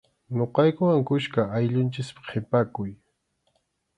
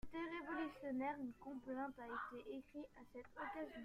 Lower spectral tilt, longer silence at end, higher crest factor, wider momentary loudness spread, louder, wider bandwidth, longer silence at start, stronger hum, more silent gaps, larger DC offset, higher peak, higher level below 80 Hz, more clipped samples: first, -8 dB/octave vs -6 dB/octave; first, 1.05 s vs 0 s; about the same, 20 dB vs 16 dB; about the same, 12 LU vs 11 LU; first, -25 LUFS vs -49 LUFS; second, 10 kHz vs 14.5 kHz; first, 0.3 s vs 0.05 s; neither; neither; neither; first, -6 dBFS vs -32 dBFS; first, -60 dBFS vs -70 dBFS; neither